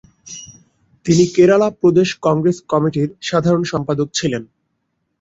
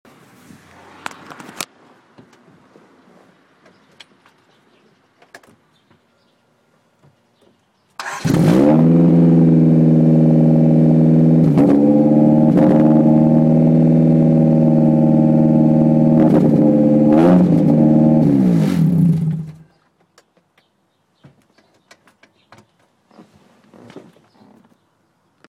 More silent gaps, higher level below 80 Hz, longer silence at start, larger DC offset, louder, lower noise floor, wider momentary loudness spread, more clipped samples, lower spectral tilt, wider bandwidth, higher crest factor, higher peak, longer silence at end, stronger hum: neither; about the same, -52 dBFS vs -48 dBFS; second, 0.25 s vs 1.6 s; neither; second, -16 LUFS vs -12 LUFS; first, -70 dBFS vs -63 dBFS; first, 16 LU vs 12 LU; neither; second, -6 dB/octave vs -9.5 dB/octave; second, 8 kHz vs 9.6 kHz; about the same, 16 dB vs 12 dB; about the same, -2 dBFS vs -4 dBFS; second, 0.75 s vs 1.5 s; neither